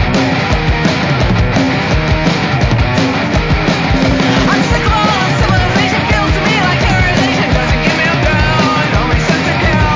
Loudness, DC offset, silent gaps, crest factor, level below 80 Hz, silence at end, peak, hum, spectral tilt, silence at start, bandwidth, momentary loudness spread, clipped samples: -12 LUFS; under 0.1%; none; 10 dB; -20 dBFS; 0 s; 0 dBFS; none; -5.5 dB/octave; 0 s; 7.6 kHz; 2 LU; under 0.1%